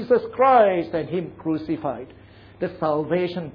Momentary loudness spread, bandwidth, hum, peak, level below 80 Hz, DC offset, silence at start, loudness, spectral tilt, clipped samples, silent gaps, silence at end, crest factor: 15 LU; 5.2 kHz; none; -6 dBFS; -56 dBFS; under 0.1%; 0 s; -22 LUFS; -9.5 dB/octave; under 0.1%; none; 0.05 s; 16 dB